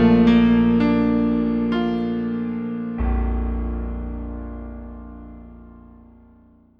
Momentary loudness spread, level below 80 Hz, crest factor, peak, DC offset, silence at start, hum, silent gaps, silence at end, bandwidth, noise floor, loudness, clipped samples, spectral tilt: 23 LU; -30 dBFS; 16 dB; -6 dBFS; under 0.1%; 0 s; none; none; 0.9 s; 5.4 kHz; -52 dBFS; -20 LUFS; under 0.1%; -9.5 dB/octave